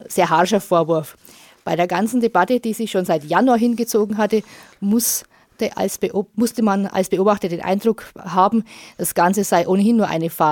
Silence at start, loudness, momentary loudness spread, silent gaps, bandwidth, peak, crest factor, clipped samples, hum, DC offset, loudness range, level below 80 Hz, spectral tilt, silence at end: 0 s; -19 LUFS; 7 LU; none; 17.5 kHz; -2 dBFS; 18 dB; under 0.1%; none; under 0.1%; 2 LU; -60 dBFS; -5 dB/octave; 0 s